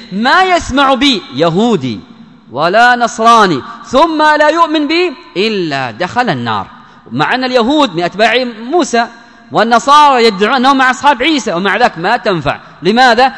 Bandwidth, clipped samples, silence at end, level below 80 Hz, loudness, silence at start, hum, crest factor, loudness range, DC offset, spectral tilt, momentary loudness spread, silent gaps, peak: 11 kHz; 2%; 0 s; -42 dBFS; -10 LUFS; 0 s; none; 10 dB; 4 LU; 0.2%; -4 dB/octave; 9 LU; none; 0 dBFS